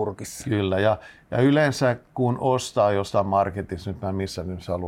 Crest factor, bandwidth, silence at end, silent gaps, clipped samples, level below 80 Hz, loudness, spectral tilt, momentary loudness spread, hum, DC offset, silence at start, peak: 14 dB; 16 kHz; 0 s; none; under 0.1%; -52 dBFS; -24 LUFS; -6 dB/octave; 10 LU; none; under 0.1%; 0 s; -8 dBFS